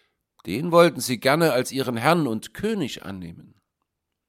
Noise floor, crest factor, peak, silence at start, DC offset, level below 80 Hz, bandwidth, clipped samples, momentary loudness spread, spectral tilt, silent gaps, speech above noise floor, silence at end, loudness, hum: -80 dBFS; 22 dB; -2 dBFS; 0.45 s; under 0.1%; -60 dBFS; 16.5 kHz; under 0.1%; 18 LU; -5 dB/octave; none; 57 dB; 0.85 s; -22 LUFS; none